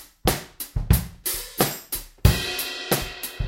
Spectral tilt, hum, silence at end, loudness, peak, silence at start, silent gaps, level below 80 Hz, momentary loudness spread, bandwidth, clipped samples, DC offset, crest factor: -4 dB/octave; none; 0 s; -25 LUFS; -2 dBFS; 0 s; none; -32 dBFS; 10 LU; 17 kHz; under 0.1%; under 0.1%; 24 dB